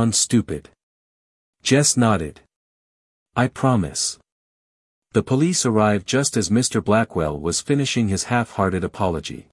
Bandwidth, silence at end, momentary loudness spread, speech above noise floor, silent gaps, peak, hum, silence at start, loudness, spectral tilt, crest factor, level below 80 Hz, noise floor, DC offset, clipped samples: 12 kHz; 0.1 s; 8 LU; over 70 dB; 0.83-1.53 s, 2.56-3.26 s, 4.32-5.02 s; -2 dBFS; none; 0 s; -20 LUFS; -4.5 dB/octave; 18 dB; -50 dBFS; under -90 dBFS; under 0.1%; under 0.1%